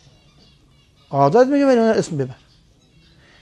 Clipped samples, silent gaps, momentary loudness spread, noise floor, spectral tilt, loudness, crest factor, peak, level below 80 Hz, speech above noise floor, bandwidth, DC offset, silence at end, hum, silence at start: under 0.1%; none; 12 LU; -54 dBFS; -6.5 dB/octave; -17 LUFS; 18 dB; -2 dBFS; -58 dBFS; 38 dB; 10.5 kHz; under 0.1%; 1.1 s; none; 1.1 s